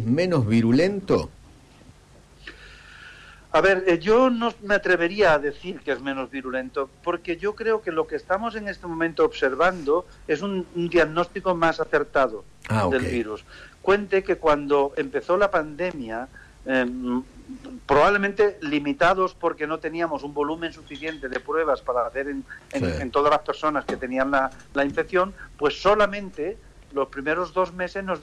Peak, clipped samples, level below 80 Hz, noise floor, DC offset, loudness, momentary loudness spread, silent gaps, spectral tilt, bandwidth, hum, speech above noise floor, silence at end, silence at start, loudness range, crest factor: -10 dBFS; under 0.1%; -48 dBFS; -51 dBFS; under 0.1%; -24 LUFS; 13 LU; none; -6 dB/octave; 11 kHz; none; 28 dB; 0 s; 0 s; 4 LU; 12 dB